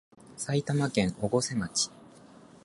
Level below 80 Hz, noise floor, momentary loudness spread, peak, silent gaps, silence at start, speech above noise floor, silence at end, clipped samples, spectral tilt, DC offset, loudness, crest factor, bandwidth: -58 dBFS; -53 dBFS; 6 LU; -12 dBFS; none; 0.3 s; 24 dB; 0.55 s; under 0.1%; -4.5 dB/octave; under 0.1%; -29 LUFS; 20 dB; 11.5 kHz